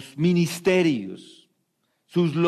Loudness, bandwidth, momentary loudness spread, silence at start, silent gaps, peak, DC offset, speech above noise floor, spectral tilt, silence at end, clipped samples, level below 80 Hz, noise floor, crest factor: -23 LUFS; 14 kHz; 14 LU; 0 s; none; -10 dBFS; under 0.1%; 51 dB; -6.5 dB/octave; 0 s; under 0.1%; -64 dBFS; -73 dBFS; 14 dB